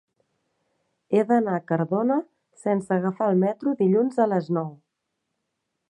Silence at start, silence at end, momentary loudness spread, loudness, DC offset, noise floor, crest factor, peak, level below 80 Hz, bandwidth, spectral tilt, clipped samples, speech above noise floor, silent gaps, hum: 1.1 s; 1.15 s; 7 LU; -24 LUFS; under 0.1%; -80 dBFS; 18 dB; -8 dBFS; -74 dBFS; 10.5 kHz; -9 dB/octave; under 0.1%; 57 dB; none; none